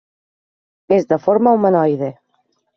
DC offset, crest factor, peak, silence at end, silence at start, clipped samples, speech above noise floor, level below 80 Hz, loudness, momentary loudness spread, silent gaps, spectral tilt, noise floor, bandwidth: under 0.1%; 14 dB; -2 dBFS; 0.65 s; 0.9 s; under 0.1%; 51 dB; -60 dBFS; -16 LUFS; 8 LU; none; -8 dB/octave; -65 dBFS; 6.4 kHz